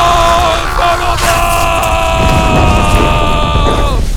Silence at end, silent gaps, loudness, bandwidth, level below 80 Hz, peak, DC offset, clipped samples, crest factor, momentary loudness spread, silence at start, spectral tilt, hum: 0 s; none; -10 LUFS; 19.5 kHz; -14 dBFS; 0 dBFS; under 0.1%; 0.4%; 10 dB; 3 LU; 0 s; -4.5 dB/octave; none